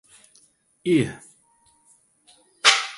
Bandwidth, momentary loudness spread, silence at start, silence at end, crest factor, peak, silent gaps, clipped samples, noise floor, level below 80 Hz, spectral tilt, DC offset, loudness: 11.5 kHz; 16 LU; 0.85 s; 0 s; 26 dB; -2 dBFS; none; under 0.1%; -61 dBFS; -64 dBFS; -2.5 dB/octave; under 0.1%; -21 LUFS